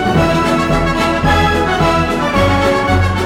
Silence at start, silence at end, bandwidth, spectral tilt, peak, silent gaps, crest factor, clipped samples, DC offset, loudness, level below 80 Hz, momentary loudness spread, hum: 0 s; 0 s; 16 kHz; -6 dB/octave; -4 dBFS; none; 10 dB; under 0.1%; under 0.1%; -13 LUFS; -24 dBFS; 2 LU; none